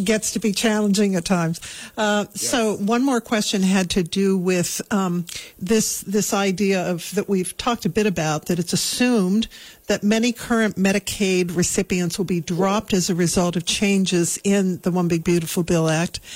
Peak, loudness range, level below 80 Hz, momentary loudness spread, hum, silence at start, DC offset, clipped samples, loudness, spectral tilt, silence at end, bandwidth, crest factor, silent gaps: -8 dBFS; 2 LU; -48 dBFS; 5 LU; none; 0 s; under 0.1%; under 0.1%; -21 LUFS; -4.5 dB/octave; 0 s; 16 kHz; 12 dB; none